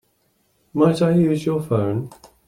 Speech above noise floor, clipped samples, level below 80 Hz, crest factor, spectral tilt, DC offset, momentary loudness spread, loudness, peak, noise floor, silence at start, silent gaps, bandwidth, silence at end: 46 dB; under 0.1%; -56 dBFS; 18 dB; -8 dB/octave; under 0.1%; 12 LU; -20 LUFS; -4 dBFS; -65 dBFS; 0.75 s; none; 13.5 kHz; 0.35 s